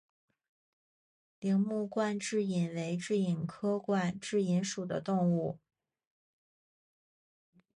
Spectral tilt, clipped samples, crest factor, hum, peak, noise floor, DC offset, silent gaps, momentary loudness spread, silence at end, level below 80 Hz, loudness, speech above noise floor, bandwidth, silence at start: -6 dB/octave; under 0.1%; 14 dB; none; -20 dBFS; under -90 dBFS; under 0.1%; none; 5 LU; 2.2 s; -74 dBFS; -33 LUFS; over 58 dB; 11 kHz; 1.4 s